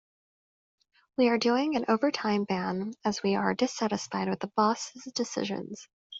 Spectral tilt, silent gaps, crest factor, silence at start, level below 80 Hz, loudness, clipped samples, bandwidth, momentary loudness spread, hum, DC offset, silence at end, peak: -4.5 dB/octave; 5.93-6.10 s; 18 dB; 1.2 s; -70 dBFS; -29 LUFS; under 0.1%; 8 kHz; 9 LU; none; under 0.1%; 0 s; -10 dBFS